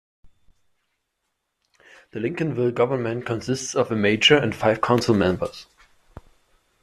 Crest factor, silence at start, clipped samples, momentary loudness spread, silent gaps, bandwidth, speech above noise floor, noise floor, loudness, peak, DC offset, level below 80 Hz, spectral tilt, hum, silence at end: 22 dB; 0.25 s; under 0.1%; 13 LU; none; 14 kHz; 56 dB; -77 dBFS; -21 LUFS; -4 dBFS; under 0.1%; -56 dBFS; -4.5 dB/octave; none; 1.2 s